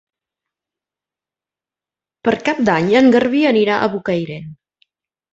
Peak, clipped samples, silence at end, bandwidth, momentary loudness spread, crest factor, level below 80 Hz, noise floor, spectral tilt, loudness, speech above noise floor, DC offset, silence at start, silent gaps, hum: -2 dBFS; under 0.1%; 0.8 s; 8 kHz; 10 LU; 16 dB; -58 dBFS; -89 dBFS; -6.5 dB/octave; -15 LUFS; 75 dB; under 0.1%; 2.25 s; none; none